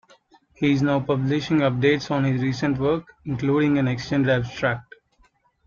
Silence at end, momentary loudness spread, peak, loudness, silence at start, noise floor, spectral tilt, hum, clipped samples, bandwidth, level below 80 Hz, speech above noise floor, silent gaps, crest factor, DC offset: 0.85 s; 6 LU; -6 dBFS; -22 LUFS; 0.6 s; -61 dBFS; -7 dB/octave; none; under 0.1%; 7.2 kHz; -52 dBFS; 40 dB; none; 16 dB; under 0.1%